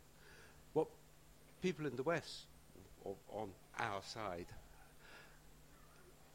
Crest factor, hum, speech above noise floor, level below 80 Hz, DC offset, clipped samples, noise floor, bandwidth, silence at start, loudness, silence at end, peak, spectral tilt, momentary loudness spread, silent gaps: 24 dB; none; 21 dB; -68 dBFS; under 0.1%; under 0.1%; -65 dBFS; 16 kHz; 0 s; -45 LUFS; 0 s; -22 dBFS; -5 dB/octave; 23 LU; none